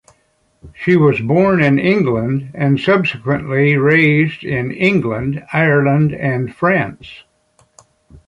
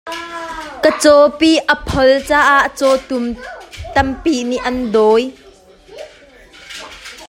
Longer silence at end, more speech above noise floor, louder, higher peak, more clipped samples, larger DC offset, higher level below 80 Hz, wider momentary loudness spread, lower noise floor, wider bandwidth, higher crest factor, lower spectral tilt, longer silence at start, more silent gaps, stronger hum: first, 1.1 s vs 0 s; first, 45 dB vs 31 dB; about the same, -15 LUFS vs -13 LUFS; about the same, -2 dBFS vs 0 dBFS; neither; neither; second, -48 dBFS vs -38 dBFS; second, 9 LU vs 21 LU; first, -60 dBFS vs -43 dBFS; second, 7.6 kHz vs 16.5 kHz; about the same, 14 dB vs 16 dB; first, -8.5 dB/octave vs -4 dB/octave; first, 0.65 s vs 0.05 s; neither; neither